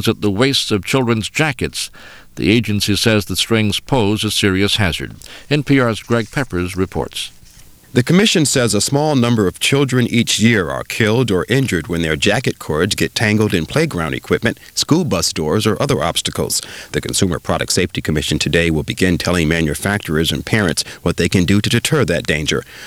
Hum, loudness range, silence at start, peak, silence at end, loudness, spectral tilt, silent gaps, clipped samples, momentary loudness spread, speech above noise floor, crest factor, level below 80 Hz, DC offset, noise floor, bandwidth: none; 3 LU; 0 s; 0 dBFS; 0 s; -16 LUFS; -4.5 dB/octave; none; under 0.1%; 7 LU; 26 dB; 16 dB; -38 dBFS; 0.2%; -42 dBFS; over 20 kHz